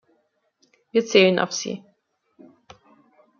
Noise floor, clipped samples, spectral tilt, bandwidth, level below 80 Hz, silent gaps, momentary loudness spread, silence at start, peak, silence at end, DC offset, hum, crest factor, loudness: -69 dBFS; under 0.1%; -4 dB/octave; 7.2 kHz; -72 dBFS; none; 15 LU; 0.95 s; -2 dBFS; 1.6 s; under 0.1%; none; 22 dB; -20 LUFS